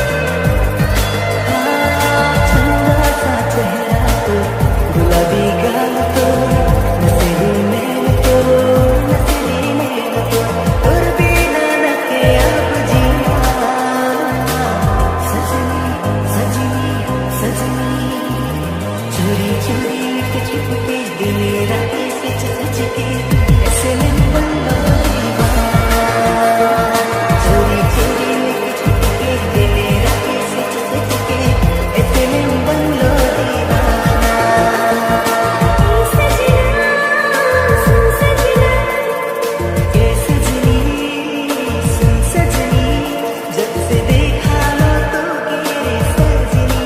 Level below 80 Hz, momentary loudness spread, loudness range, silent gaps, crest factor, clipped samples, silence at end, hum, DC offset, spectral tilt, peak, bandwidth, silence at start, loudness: -20 dBFS; 6 LU; 5 LU; none; 14 dB; under 0.1%; 0 s; none; under 0.1%; -5.5 dB/octave; 0 dBFS; 16 kHz; 0 s; -14 LUFS